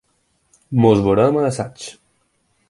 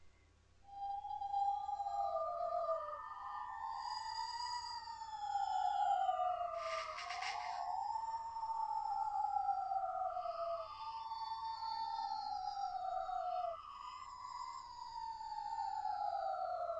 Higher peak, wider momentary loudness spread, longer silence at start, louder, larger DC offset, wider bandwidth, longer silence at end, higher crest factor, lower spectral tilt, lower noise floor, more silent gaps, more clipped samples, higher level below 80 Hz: first, 0 dBFS vs -26 dBFS; first, 18 LU vs 9 LU; first, 0.7 s vs 0 s; first, -17 LUFS vs -42 LUFS; neither; first, 11.5 kHz vs 9.2 kHz; first, 0.8 s vs 0 s; about the same, 18 dB vs 16 dB; first, -7 dB/octave vs -1.5 dB/octave; about the same, -65 dBFS vs -68 dBFS; neither; neither; first, -48 dBFS vs -72 dBFS